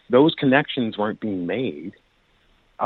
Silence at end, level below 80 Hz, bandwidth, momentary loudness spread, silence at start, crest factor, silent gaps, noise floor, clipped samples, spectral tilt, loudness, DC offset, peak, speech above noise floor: 0 s; -64 dBFS; 4.4 kHz; 14 LU; 0.1 s; 18 dB; none; -61 dBFS; under 0.1%; -9 dB/octave; -21 LUFS; under 0.1%; -4 dBFS; 40 dB